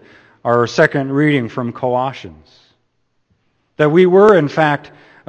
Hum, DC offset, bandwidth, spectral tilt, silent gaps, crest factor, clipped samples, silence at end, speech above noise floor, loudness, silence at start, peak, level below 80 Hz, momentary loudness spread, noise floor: none; under 0.1%; 8.4 kHz; -7 dB/octave; none; 16 dB; under 0.1%; 0.5 s; 51 dB; -14 LUFS; 0.45 s; 0 dBFS; -56 dBFS; 14 LU; -65 dBFS